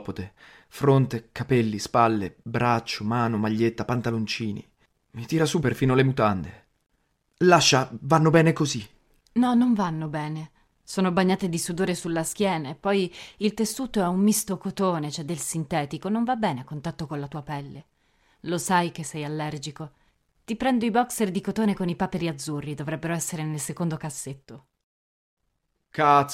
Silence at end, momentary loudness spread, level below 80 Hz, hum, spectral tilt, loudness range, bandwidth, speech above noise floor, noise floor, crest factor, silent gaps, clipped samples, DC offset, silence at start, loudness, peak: 0 s; 14 LU; -56 dBFS; none; -5 dB/octave; 8 LU; 16 kHz; 51 dB; -75 dBFS; 22 dB; 24.83-25.37 s; under 0.1%; under 0.1%; 0 s; -25 LUFS; -4 dBFS